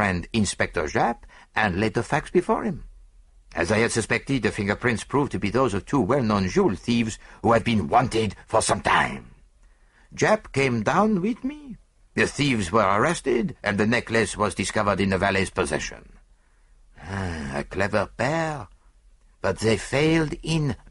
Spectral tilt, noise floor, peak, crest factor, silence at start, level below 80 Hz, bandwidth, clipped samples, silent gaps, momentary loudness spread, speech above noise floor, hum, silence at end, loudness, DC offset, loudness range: -5 dB/octave; -57 dBFS; -6 dBFS; 18 dB; 0 s; -46 dBFS; 11.5 kHz; under 0.1%; none; 9 LU; 34 dB; none; 0.15 s; -24 LUFS; under 0.1%; 5 LU